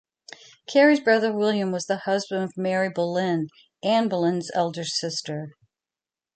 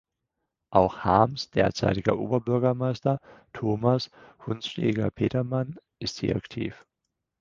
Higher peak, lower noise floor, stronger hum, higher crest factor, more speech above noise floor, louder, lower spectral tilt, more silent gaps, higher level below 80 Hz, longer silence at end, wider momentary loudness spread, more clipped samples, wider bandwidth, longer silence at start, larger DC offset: about the same, -4 dBFS vs -4 dBFS; first, under -90 dBFS vs -83 dBFS; neither; about the same, 20 dB vs 24 dB; first, over 67 dB vs 57 dB; first, -24 LUFS vs -27 LUFS; second, -5 dB/octave vs -7 dB/octave; neither; second, -74 dBFS vs -52 dBFS; first, 0.85 s vs 0.65 s; about the same, 14 LU vs 12 LU; neither; first, 9.2 kHz vs 7.4 kHz; about the same, 0.7 s vs 0.7 s; neither